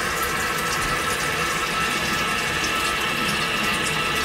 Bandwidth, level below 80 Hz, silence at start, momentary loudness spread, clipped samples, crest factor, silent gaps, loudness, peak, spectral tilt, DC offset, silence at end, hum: 16 kHz; -42 dBFS; 0 s; 1 LU; under 0.1%; 14 dB; none; -22 LUFS; -10 dBFS; -2 dB/octave; under 0.1%; 0 s; none